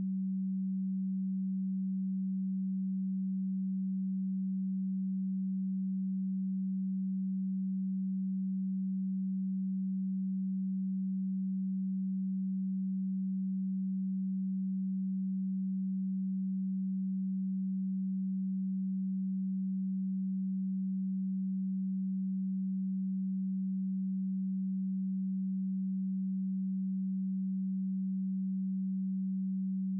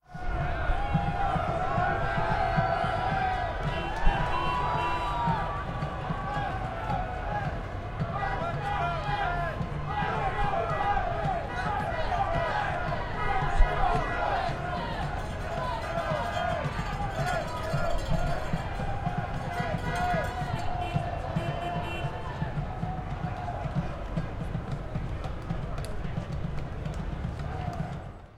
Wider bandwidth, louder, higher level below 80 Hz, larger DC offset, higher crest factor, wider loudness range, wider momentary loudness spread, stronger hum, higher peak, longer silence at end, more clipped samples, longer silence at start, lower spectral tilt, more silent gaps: second, 0.3 kHz vs 12.5 kHz; second, -35 LUFS vs -31 LUFS; second, under -90 dBFS vs -36 dBFS; neither; second, 4 dB vs 22 dB; second, 0 LU vs 6 LU; second, 0 LU vs 7 LU; neither; second, -32 dBFS vs -8 dBFS; about the same, 0 s vs 0 s; neither; about the same, 0 s vs 0.1 s; first, -27.5 dB/octave vs -6.5 dB/octave; neither